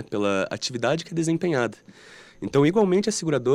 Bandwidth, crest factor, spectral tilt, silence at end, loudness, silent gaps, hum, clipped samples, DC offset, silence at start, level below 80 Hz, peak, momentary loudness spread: 12.5 kHz; 16 dB; -5 dB/octave; 0 s; -24 LUFS; none; none; under 0.1%; under 0.1%; 0 s; -62 dBFS; -8 dBFS; 7 LU